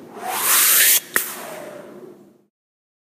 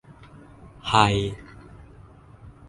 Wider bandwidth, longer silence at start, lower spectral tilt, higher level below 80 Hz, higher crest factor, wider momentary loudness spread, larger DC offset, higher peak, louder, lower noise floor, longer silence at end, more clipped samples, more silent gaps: first, 15.5 kHz vs 11.5 kHz; second, 0 s vs 0.85 s; second, 1.5 dB/octave vs -5 dB/octave; second, -74 dBFS vs -46 dBFS; about the same, 22 dB vs 26 dB; about the same, 23 LU vs 23 LU; neither; about the same, 0 dBFS vs 0 dBFS; first, -14 LUFS vs -22 LUFS; second, -44 dBFS vs -48 dBFS; first, 1 s vs 0.2 s; neither; neither